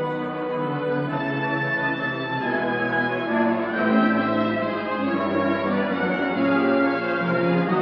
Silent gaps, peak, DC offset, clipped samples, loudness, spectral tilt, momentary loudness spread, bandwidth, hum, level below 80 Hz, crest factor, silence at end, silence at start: none; -8 dBFS; under 0.1%; under 0.1%; -23 LUFS; -9 dB/octave; 6 LU; 5.8 kHz; none; -62 dBFS; 14 dB; 0 s; 0 s